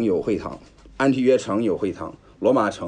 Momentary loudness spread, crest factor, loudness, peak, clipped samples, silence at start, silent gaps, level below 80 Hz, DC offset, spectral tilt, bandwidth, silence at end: 16 LU; 16 dB; -22 LUFS; -6 dBFS; under 0.1%; 0 s; none; -52 dBFS; under 0.1%; -6.5 dB/octave; 10 kHz; 0 s